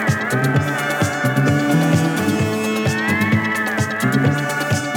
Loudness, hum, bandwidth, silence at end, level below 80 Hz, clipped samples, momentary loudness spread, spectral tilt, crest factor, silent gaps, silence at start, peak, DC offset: -18 LUFS; none; 19 kHz; 0 s; -50 dBFS; under 0.1%; 3 LU; -5.5 dB/octave; 14 dB; none; 0 s; -4 dBFS; under 0.1%